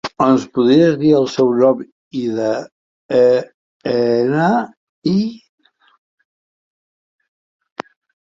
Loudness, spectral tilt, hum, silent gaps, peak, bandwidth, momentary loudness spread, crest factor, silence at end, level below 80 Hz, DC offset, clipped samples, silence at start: -16 LUFS; -7 dB/octave; none; 1.92-2.11 s, 2.72-3.09 s, 3.54-3.80 s, 4.77-5.02 s; -2 dBFS; 7.6 kHz; 16 LU; 16 dB; 2.9 s; -60 dBFS; under 0.1%; under 0.1%; 0.05 s